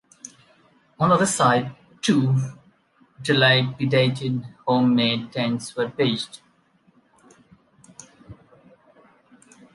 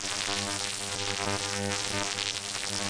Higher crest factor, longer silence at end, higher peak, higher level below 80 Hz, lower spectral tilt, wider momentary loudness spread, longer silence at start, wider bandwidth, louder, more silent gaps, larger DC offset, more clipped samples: about the same, 20 dB vs 20 dB; first, 1.4 s vs 0 s; first, -4 dBFS vs -12 dBFS; about the same, -62 dBFS vs -60 dBFS; first, -5 dB/octave vs -1.5 dB/octave; first, 15 LU vs 2 LU; first, 0.25 s vs 0 s; about the same, 11.5 kHz vs 10.5 kHz; first, -21 LUFS vs -30 LUFS; neither; neither; neither